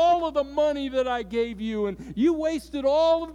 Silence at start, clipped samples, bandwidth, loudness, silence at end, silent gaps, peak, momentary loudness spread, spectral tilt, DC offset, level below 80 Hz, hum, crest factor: 0 s; under 0.1%; 12.5 kHz; -25 LUFS; 0 s; none; -12 dBFS; 7 LU; -5.5 dB/octave; under 0.1%; -50 dBFS; none; 12 dB